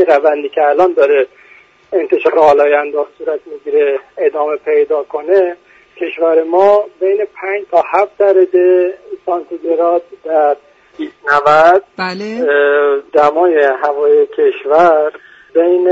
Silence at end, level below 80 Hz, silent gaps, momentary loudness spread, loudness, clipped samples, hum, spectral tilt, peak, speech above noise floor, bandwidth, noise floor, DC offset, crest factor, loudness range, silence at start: 0 s; -58 dBFS; none; 10 LU; -12 LUFS; under 0.1%; none; -6 dB/octave; 0 dBFS; 33 dB; 7.8 kHz; -44 dBFS; under 0.1%; 12 dB; 3 LU; 0 s